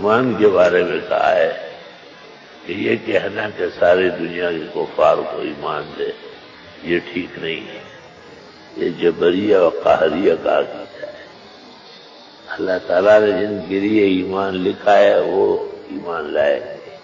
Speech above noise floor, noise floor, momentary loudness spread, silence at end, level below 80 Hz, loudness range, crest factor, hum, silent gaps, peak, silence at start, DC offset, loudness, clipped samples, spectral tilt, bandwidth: 25 dB; -42 dBFS; 19 LU; 0.05 s; -54 dBFS; 6 LU; 16 dB; none; none; -2 dBFS; 0 s; under 0.1%; -17 LUFS; under 0.1%; -6.5 dB/octave; 7.4 kHz